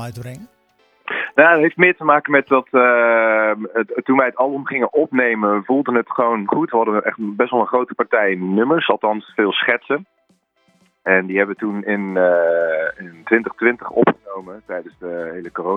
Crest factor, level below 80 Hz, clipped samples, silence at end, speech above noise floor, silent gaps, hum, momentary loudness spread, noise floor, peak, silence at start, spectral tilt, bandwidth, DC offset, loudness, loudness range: 18 dB; -66 dBFS; under 0.1%; 0 s; 44 dB; none; none; 15 LU; -61 dBFS; 0 dBFS; 0 s; -7 dB/octave; 11 kHz; under 0.1%; -17 LUFS; 5 LU